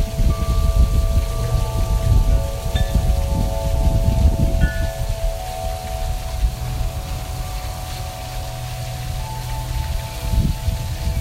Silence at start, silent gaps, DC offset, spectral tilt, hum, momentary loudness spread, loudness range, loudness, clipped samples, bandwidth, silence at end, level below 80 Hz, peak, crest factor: 0 s; none; under 0.1%; -6 dB/octave; none; 10 LU; 7 LU; -22 LUFS; under 0.1%; 16 kHz; 0 s; -20 dBFS; -2 dBFS; 18 dB